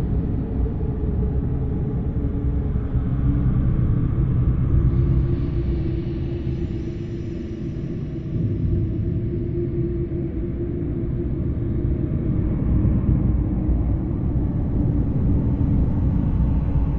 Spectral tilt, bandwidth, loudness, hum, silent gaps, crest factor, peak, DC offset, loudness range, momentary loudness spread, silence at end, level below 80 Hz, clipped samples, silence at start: -11.5 dB/octave; 4.1 kHz; -23 LUFS; none; none; 14 dB; -6 dBFS; under 0.1%; 5 LU; 6 LU; 0 s; -26 dBFS; under 0.1%; 0 s